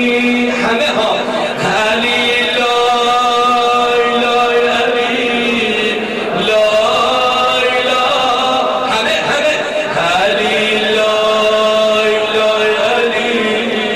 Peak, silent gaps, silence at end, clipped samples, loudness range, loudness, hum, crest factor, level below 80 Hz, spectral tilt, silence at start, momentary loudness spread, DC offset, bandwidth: -4 dBFS; none; 0 s; under 0.1%; 1 LU; -12 LUFS; none; 10 dB; -48 dBFS; -3 dB/octave; 0 s; 3 LU; 0.3%; 14.5 kHz